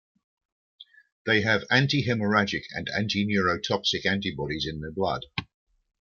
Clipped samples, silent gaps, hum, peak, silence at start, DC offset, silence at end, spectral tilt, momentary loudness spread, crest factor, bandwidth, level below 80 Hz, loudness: under 0.1%; 1.12-1.25 s; none; -6 dBFS; 0.8 s; under 0.1%; 0.55 s; -5 dB/octave; 9 LU; 22 dB; 7.2 kHz; -56 dBFS; -26 LUFS